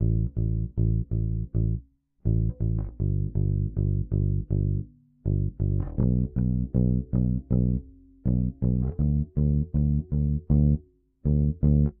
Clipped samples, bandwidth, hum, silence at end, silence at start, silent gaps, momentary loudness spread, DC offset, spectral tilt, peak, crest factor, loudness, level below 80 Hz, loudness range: under 0.1%; 1.6 kHz; none; 0.1 s; 0 s; none; 6 LU; under 0.1%; -16.5 dB/octave; -10 dBFS; 16 dB; -27 LUFS; -30 dBFS; 2 LU